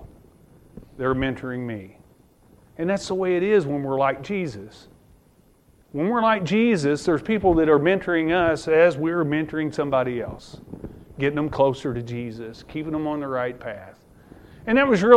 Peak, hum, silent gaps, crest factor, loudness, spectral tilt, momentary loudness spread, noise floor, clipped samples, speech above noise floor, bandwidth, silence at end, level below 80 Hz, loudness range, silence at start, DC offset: 0 dBFS; none; none; 22 dB; -22 LUFS; -6.5 dB/octave; 17 LU; -57 dBFS; under 0.1%; 35 dB; 12 kHz; 0 s; -48 dBFS; 7 LU; 0 s; under 0.1%